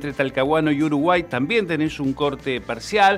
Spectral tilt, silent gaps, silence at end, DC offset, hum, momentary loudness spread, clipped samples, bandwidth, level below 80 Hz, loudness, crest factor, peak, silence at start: -5.5 dB/octave; none; 0 s; under 0.1%; none; 6 LU; under 0.1%; 13.5 kHz; -48 dBFS; -21 LUFS; 16 dB; -4 dBFS; 0 s